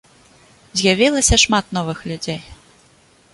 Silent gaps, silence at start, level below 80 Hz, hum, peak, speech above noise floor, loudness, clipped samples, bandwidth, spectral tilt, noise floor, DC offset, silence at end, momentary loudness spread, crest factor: none; 0.75 s; -32 dBFS; none; -2 dBFS; 35 dB; -16 LUFS; under 0.1%; 11.5 kHz; -3 dB/octave; -53 dBFS; under 0.1%; 0.8 s; 14 LU; 18 dB